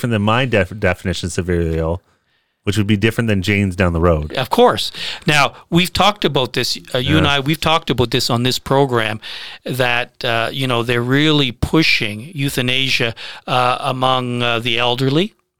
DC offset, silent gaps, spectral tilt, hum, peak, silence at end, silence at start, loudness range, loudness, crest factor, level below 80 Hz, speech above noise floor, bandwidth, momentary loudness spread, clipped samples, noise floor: 2%; none; -5 dB/octave; none; 0 dBFS; 0 s; 0 s; 2 LU; -16 LUFS; 16 dB; -36 dBFS; 47 dB; 19 kHz; 8 LU; under 0.1%; -64 dBFS